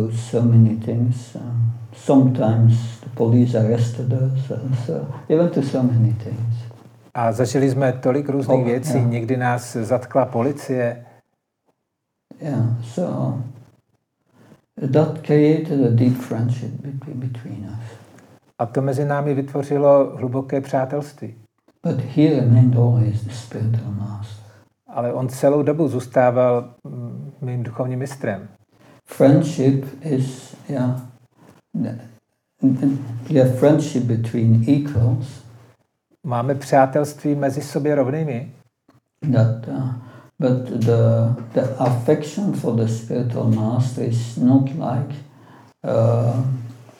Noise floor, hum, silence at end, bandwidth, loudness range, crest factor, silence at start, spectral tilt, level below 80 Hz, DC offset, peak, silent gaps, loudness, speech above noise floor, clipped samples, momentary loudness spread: -77 dBFS; none; 0.15 s; 12 kHz; 6 LU; 18 dB; 0 s; -8.5 dB/octave; -66 dBFS; under 0.1%; -2 dBFS; none; -20 LUFS; 58 dB; under 0.1%; 14 LU